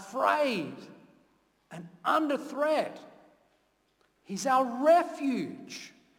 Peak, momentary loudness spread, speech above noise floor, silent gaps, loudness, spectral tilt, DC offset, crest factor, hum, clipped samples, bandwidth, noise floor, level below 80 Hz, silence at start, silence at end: -12 dBFS; 23 LU; 42 dB; none; -28 LUFS; -4.5 dB/octave; under 0.1%; 20 dB; none; under 0.1%; 17.5 kHz; -71 dBFS; -80 dBFS; 0 s; 0.3 s